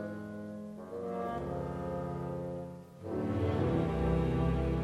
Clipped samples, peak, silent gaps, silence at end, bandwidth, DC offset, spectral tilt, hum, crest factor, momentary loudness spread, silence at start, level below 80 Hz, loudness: under 0.1%; -18 dBFS; none; 0 s; 12.5 kHz; under 0.1%; -9 dB/octave; none; 16 dB; 12 LU; 0 s; -44 dBFS; -35 LUFS